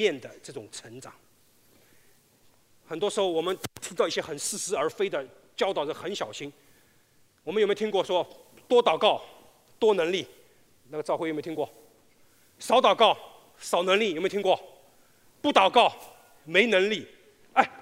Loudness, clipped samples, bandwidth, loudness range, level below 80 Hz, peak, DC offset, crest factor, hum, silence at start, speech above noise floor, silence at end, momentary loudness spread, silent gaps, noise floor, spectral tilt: -26 LUFS; under 0.1%; 16 kHz; 7 LU; -74 dBFS; -4 dBFS; under 0.1%; 24 dB; none; 0 s; 36 dB; 0 s; 19 LU; none; -62 dBFS; -3 dB/octave